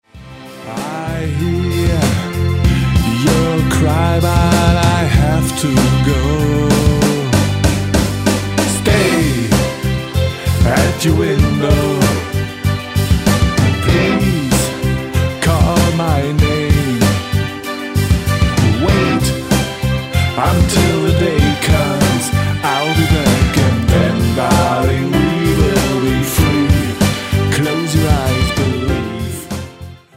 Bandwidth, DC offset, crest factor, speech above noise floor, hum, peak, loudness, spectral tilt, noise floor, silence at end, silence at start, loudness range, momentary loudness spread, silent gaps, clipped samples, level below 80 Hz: 16.5 kHz; under 0.1%; 12 dB; 22 dB; none; 0 dBFS; -14 LUFS; -5.5 dB/octave; -34 dBFS; 0.2 s; 0.15 s; 2 LU; 6 LU; none; under 0.1%; -24 dBFS